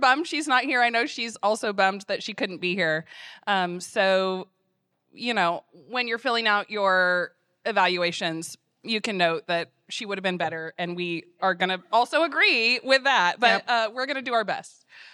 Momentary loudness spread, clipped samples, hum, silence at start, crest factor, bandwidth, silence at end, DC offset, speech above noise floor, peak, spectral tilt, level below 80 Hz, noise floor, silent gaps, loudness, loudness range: 12 LU; under 0.1%; none; 0 s; 22 dB; 13 kHz; 0.05 s; under 0.1%; 49 dB; -2 dBFS; -3.5 dB/octave; -84 dBFS; -74 dBFS; none; -24 LUFS; 5 LU